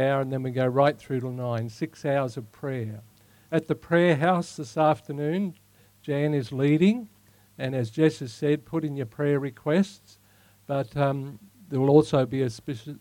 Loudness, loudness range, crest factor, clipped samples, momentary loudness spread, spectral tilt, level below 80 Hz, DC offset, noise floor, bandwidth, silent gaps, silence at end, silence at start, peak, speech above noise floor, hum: -26 LUFS; 3 LU; 22 dB; under 0.1%; 13 LU; -7.5 dB/octave; -64 dBFS; under 0.1%; -59 dBFS; 16.5 kHz; none; 0.05 s; 0 s; -4 dBFS; 33 dB; none